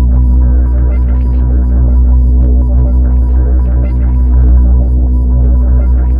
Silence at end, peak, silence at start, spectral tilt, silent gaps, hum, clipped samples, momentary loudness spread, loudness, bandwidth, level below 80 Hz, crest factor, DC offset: 0 s; 0 dBFS; 0 s; -12.5 dB/octave; none; none; 0.2%; 3 LU; -10 LUFS; 1.7 kHz; -8 dBFS; 8 dB; under 0.1%